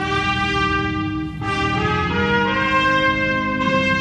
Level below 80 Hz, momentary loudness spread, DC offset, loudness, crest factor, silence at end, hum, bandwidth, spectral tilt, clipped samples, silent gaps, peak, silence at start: -36 dBFS; 7 LU; under 0.1%; -19 LUFS; 12 dB; 0 s; none; 10.5 kHz; -5.5 dB/octave; under 0.1%; none; -6 dBFS; 0 s